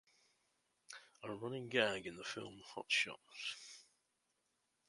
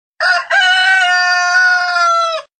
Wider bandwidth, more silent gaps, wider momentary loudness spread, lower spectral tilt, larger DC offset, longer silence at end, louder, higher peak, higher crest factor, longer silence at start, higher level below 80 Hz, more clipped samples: first, 11.5 kHz vs 9.4 kHz; neither; first, 20 LU vs 5 LU; first, -3 dB/octave vs 4 dB/octave; neither; first, 1.05 s vs 0.2 s; second, -41 LUFS vs -11 LUFS; second, -18 dBFS vs -2 dBFS; first, 26 dB vs 12 dB; first, 0.9 s vs 0.2 s; second, -82 dBFS vs -72 dBFS; neither